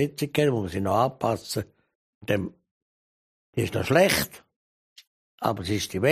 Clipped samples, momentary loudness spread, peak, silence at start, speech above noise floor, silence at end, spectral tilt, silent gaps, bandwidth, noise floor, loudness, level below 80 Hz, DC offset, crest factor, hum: under 0.1%; 13 LU; -6 dBFS; 0 s; over 65 dB; 0 s; -5 dB/octave; 1.95-2.21 s, 2.71-3.53 s, 4.56-4.96 s, 5.07-5.38 s; 15 kHz; under -90 dBFS; -26 LUFS; -54 dBFS; under 0.1%; 20 dB; none